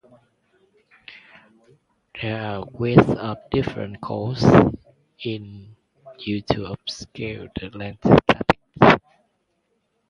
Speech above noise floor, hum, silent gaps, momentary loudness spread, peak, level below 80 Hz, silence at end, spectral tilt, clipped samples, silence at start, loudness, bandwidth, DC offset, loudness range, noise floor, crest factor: 50 dB; none; none; 18 LU; 0 dBFS; -44 dBFS; 1.1 s; -7.5 dB/octave; under 0.1%; 1.1 s; -21 LUFS; 10.5 kHz; under 0.1%; 4 LU; -71 dBFS; 22 dB